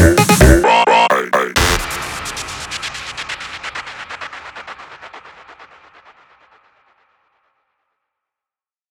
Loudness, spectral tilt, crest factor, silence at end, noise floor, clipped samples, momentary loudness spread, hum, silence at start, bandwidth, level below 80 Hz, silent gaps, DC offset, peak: -14 LUFS; -4.5 dB/octave; 18 dB; 3.25 s; under -90 dBFS; under 0.1%; 24 LU; none; 0 s; over 20 kHz; -26 dBFS; none; under 0.1%; 0 dBFS